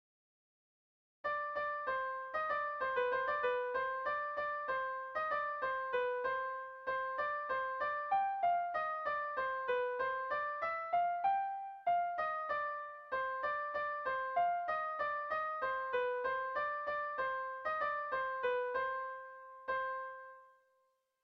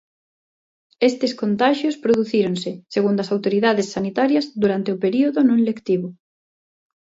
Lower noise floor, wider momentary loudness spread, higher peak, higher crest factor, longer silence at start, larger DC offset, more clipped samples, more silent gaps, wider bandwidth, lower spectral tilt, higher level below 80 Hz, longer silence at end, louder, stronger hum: second, -78 dBFS vs under -90 dBFS; about the same, 5 LU vs 6 LU; second, -24 dBFS vs -4 dBFS; about the same, 14 dB vs 16 dB; first, 1.25 s vs 1 s; neither; neither; neither; second, 6 kHz vs 8 kHz; second, -4.5 dB/octave vs -6 dB/octave; second, -74 dBFS vs -64 dBFS; second, 0.75 s vs 0.9 s; second, -37 LUFS vs -20 LUFS; neither